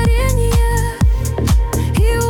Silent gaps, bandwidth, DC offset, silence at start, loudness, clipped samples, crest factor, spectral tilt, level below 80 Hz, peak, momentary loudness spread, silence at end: none; 17.5 kHz; under 0.1%; 0 s; -16 LUFS; under 0.1%; 10 dB; -6 dB/octave; -16 dBFS; -4 dBFS; 2 LU; 0 s